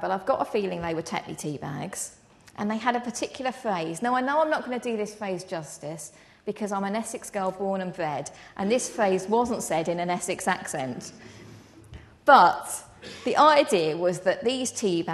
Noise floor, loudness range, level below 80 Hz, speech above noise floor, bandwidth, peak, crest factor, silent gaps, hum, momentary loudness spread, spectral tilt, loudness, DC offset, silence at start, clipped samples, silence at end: -48 dBFS; 9 LU; -62 dBFS; 22 dB; 12.5 kHz; -2 dBFS; 24 dB; none; none; 17 LU; -4 dB/octave; -26 LUFS; under 0.1%; 0 s; under 0.1%; 0 s